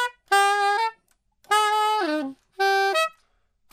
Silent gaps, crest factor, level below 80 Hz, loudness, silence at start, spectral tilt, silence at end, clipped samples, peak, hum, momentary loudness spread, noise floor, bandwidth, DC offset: none; 18 dB; -74 dBFS; -22 LUFS; 0 s; 0.5 dB/octave; 0.65 s; under 0.1%; -6 dBFS; none; 9 LU; -67 dBFS; 16 kHz; under 0.1%